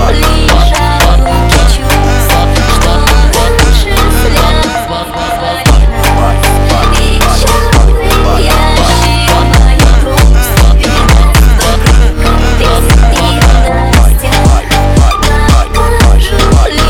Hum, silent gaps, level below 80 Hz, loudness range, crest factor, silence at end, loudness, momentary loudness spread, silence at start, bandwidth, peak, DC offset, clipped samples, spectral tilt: none; none; -8 dBFS; 2 LU; 6 dB; 0 s; -8 LUFS; 2 LU; 0 s; 17 kHz; 0 dBFS; 2%; under 0.1%; -4.5 dB/octave